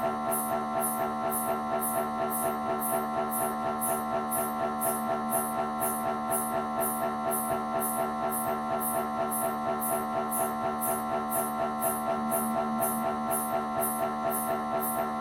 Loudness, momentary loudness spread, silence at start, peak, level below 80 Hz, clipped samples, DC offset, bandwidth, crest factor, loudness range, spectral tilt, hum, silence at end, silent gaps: -30 LUFS; 1 LU; 0 s; -16 dBFS; -60 dBFS; under 0.1%; under 0.1%; 17 kHz; 14 dB; 0 LU; -4 dB/octave; none; 0 s; none